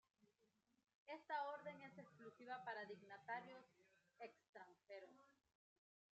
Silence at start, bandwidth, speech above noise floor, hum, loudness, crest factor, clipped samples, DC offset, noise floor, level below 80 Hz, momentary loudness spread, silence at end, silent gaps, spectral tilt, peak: 0.2 s; 8 kHz; 29 dB; none; -55 LUFS; 22 dB; under 0.1%; under 0.1%; -85 dBFS; under -90 dBFS; 16 LU; 0.8 s; 0.95-1.06 s, 4.49-4.53 s; -2 dB/octave; -36 dBFS